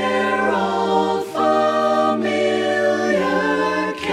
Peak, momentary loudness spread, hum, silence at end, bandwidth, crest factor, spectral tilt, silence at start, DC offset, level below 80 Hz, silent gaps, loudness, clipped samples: -4 dBFS; 2 LU; none; 0 s; 14 kHz; 14 dB; -5 dB/octave; 0 s; under 0.1%; -60 dBFS; none; -18 LUFS; under 0.1%